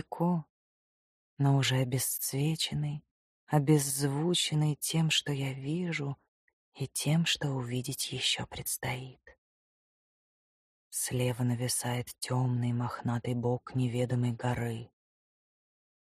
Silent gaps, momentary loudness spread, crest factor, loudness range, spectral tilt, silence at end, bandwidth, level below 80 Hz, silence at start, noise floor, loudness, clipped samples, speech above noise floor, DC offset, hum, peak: 0.49-1.37 s, 3.11-3.47 s, 6.28-6.72 s, 9.38-10.91 s; 9 LU; 20 dB; 6 LU; -4.5 dB/octave; 1.2 s; 15.5 kHz; -64 dBFS; 0.1 s; under -90 dBFS; -31 LUFS; under 0.1%; over 59 dB; under 0.1%; none; -12 dBFS